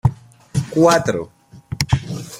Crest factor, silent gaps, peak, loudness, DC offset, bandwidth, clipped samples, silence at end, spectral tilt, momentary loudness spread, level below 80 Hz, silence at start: 20 dB; none; 0 dBFS; -19 LUFS; under 0.1%; 16.5 kHz; under 0.1%; 0 s; -5.5 dB/octave; 15 LU; -40 dBFS; 0.05 s